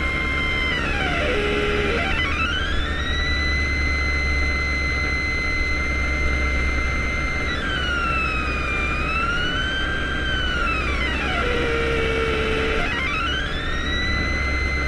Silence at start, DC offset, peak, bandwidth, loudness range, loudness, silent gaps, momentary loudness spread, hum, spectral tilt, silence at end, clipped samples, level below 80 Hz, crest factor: 0 s; under 0.1%; -8 dBFS; 11 kHz; 1 LU; -22 LUFS; none; 2 LU; none; -4.5 dB/octave; 0 s; under 0.1%; -28 dBFS; 14 dB